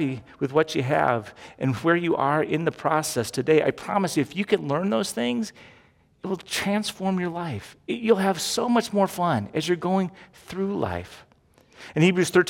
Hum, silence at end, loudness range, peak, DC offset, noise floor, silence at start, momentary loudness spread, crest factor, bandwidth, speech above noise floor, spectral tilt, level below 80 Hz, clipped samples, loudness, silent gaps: none; 0 s; 4 LU; -6 dBFS; under 0.1%; -58 dBFS; 0 s; 11 LU; 18 dB; 17 kHz; 33 dB; -5 dB/octave; -62 dBFS; under 0.1%; -24 LUFS; none